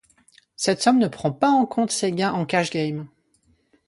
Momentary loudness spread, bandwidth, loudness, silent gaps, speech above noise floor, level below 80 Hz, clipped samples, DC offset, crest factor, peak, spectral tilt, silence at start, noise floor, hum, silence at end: 8 LU; 11.5 kHz; -22 LUFS; none; 43 dB; -64 dBFS; under 0.1%; under 0.1%; 18 dB; -6 dBFS; -4.5 dB/octave; 0.6 s; -64 dBFS; none; 0.8 s